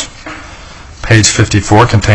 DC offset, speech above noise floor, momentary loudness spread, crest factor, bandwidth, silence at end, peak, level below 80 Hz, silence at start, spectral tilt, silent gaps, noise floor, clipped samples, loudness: under 0.1%; 23 dB; 20 LU; 10 dB; 10.5 kHz; 0 s; 0 dBFS; -28 dBFS; 0 s; -4.5 dB/octave; none; -31 dBFS; 0.7%; -8 LUFS